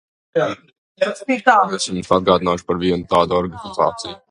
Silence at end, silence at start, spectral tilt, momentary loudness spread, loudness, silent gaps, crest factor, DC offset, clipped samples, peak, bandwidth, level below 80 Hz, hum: 0.15 s; 0.35 s; -4.5 dB/octave; 10 LU; -18 LUFS; 0.78-0.95 s; 18 dB; under 0.1%; under 0.1%; 0 dBFS; 11 kHz; -46 dBFS; none